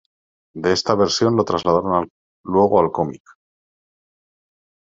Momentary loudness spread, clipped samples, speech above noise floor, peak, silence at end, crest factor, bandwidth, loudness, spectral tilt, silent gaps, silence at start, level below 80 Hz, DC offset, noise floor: 12 LU; under 0.1%; over 72 dB; -2 dBFS; 1.7 s; 20 dB; 7.8 kHz; -18 LUFS; -5 dB/octave; 2.10-2.44 s; 0.55 s; -58 dBFS; under 0.1%; under -90 dBFS